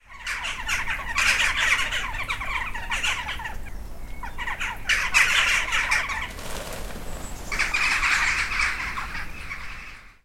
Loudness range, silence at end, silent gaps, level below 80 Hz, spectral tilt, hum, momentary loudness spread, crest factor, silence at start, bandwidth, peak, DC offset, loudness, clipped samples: 3 LU; 0.15 s; none; -38 dBFS; -0.5 dB/octave; none; 17 LU; 22 dB; 0.1 s; 16.5 kHz; -4 dBFS; under 0.1%; -23 LUFS; under 0.1%